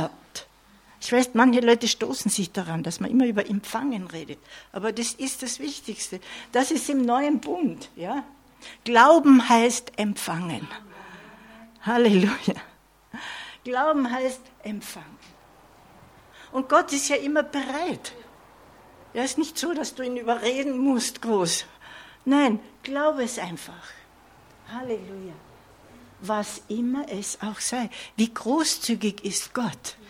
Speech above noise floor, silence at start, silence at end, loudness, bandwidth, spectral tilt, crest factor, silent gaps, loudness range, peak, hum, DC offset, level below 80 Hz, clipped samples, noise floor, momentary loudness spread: 31 dB; 0 s; 0.15 s; -24 LUFS; 16.5 kHz; -4 dB/octave; 22 dB; none; 10 LU; -4 dBFS; none; under 0.1%; -64 dBFS; under 0.1%; -55 dBFS; 20 LU